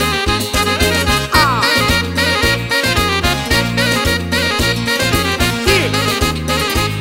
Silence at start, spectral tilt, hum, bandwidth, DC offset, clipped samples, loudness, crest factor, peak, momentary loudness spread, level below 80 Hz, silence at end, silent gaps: 0 s; -3.5 dB/octave; none; 16.5 kHz; under 0.1%; under 0.1%; -14 LUFS; 14 dB; 0 dBFS; 3 LU; -26 dBFS; 0 s; none